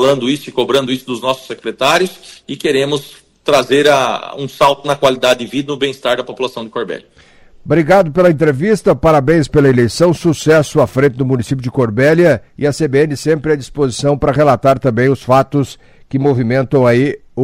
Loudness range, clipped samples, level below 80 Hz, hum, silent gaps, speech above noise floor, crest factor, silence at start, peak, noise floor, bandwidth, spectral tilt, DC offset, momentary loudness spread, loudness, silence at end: 4 LU; under 0.1%; -40 dBFS; none; none; 29 dB; 14 dB; 0 s; 0 dBFS; -42 dBFS; 16 kHz; -6 dB/octave; under 0.1%; 10 LU; -13 LUFS; 0 s